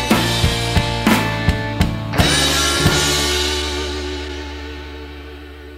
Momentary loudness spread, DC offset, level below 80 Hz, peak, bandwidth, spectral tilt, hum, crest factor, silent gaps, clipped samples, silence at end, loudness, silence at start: 18 LU; under 0.1%; -28 dBFS; 0 dBFS; 16 kHz; -3.5 dB/octave; none; 18 dB; none; under 0.1%; 0 s; -17 LUFS; 0 s